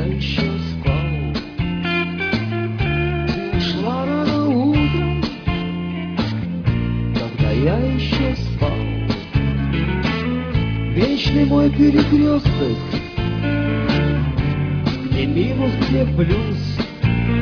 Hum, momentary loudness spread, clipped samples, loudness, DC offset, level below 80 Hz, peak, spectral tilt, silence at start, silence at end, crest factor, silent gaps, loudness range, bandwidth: none; 7 LU; under 0.1%; -19 LUFS; under 0.1%; -28 dBFS; -2 dBFS; -8 dB/octave; 0 s; 0 s; 16 dB; none; 4 LU; 5.4 kHz